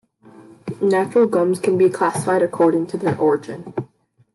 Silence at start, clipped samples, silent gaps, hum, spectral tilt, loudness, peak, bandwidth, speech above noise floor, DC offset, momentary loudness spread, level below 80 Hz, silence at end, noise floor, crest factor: 0.65 s; under 0.1%; none; none; -6.5 dB/octave; -18 LUFS; -4 dBFS; 12 kHz; 37 dB; under 0.1%; 14 LU; -66 dBFS; 0.5 s; -55 dBFS; 14 dB